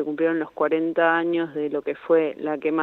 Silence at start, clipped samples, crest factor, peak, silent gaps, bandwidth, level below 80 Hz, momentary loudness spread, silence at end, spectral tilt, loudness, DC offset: 0 s; under 0.1%; 16 dB; -6 dBFS; none; 4.1 kHz; -72 dBFS; 7 LU; 0 s; -8 dB/octave; -23 LUFS; under 0.1%